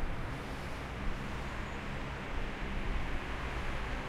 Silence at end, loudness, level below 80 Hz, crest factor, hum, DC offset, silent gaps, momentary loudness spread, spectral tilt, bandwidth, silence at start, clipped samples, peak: 0 s; -40 LUFS; -40 dBFS; 14 dB; none; under 0.1%; none; 2 LU; -5.5 dB/octave; 13 kHz; 0 s; under 0.1%; -22 dBFS